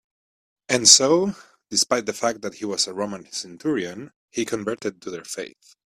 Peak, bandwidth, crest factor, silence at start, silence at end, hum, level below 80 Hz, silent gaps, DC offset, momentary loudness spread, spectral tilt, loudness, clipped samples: 0 dBFS; 15.5 kHz; 24 dB; 0.7 s; 0.4 s; none; -66 dBFS; 4.16-4.28 s; under 0.1%; 20 LU; -1.5 dB/octave; -20 LUFS; under 0.1%